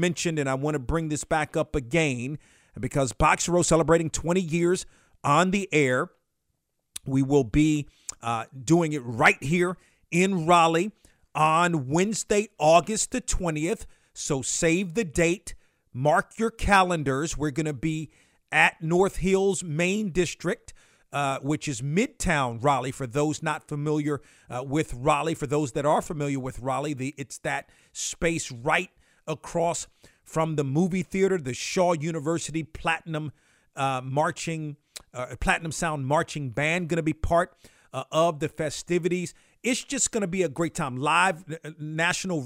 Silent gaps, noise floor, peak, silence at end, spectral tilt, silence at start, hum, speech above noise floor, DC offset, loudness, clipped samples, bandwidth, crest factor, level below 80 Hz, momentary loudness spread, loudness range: none; -77 dBFS; -6 dBFS; 0 s; -4.5 dB/octave; 0 s; none; 51 dB; under 0.1%; -26 LUFS; under 0.1%; 16 kHz; 20 dB; -44 dBFS; 13 LU; 5 LU